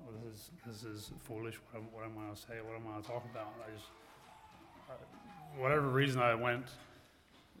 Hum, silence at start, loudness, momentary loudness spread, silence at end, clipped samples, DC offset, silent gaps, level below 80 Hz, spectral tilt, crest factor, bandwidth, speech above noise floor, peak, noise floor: none; 0 s; -38 LUFS; 26 LU; 0 s; under 0.1%; under 0.1%; none; -68 dBFS; -6 dB/octave; 24 dB; 17 kHz; 26 dB; -16 dBFS; -65 dBFS